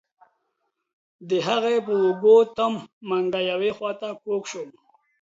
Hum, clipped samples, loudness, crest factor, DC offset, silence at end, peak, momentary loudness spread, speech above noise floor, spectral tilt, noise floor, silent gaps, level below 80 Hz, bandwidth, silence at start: none; under 0.1%; -23 LUFS; 18 dB; under 0.1%; 0.5 s; -6 dBFS; 16 LU; 54 dB; -5 dB/octave; -76 dBFS; 2.93-3.01 s; -72 dBFS; 7.8 kHz; 1.2 s